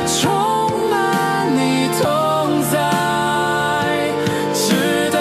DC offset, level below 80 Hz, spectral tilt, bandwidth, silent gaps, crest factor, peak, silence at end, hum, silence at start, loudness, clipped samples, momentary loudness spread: under 0.1%; -50 dBFS; -4 dB/octave; 15.5 kHz; none; 14 dB; -4 dBFS; 0 s; none; 0 s; -17 LUFS; under 0.1%; 2 LU